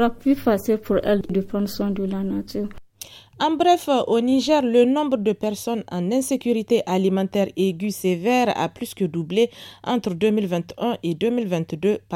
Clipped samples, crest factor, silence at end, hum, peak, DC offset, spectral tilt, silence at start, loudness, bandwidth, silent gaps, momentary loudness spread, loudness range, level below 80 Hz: under 0.1%; 16 dB; 0 s; none; -4 dBFS; under 0.1%; -6 dB/octave; 0 s; -22 LUFS; 17 kHz; none; 8 LU; 3 LU; -50 dBFS